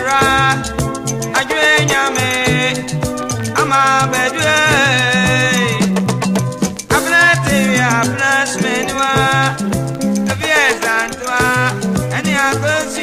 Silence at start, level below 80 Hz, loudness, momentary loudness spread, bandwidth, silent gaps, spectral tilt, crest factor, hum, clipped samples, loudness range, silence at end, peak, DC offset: 0 s; -38 dBFS; -14 LUFS; 8 LU; 15.5 kHz; none; -4 dB/octave; 14 dB; none; under 0.1%; 2 LU; 0 s; 0 dBFS; under 0.1%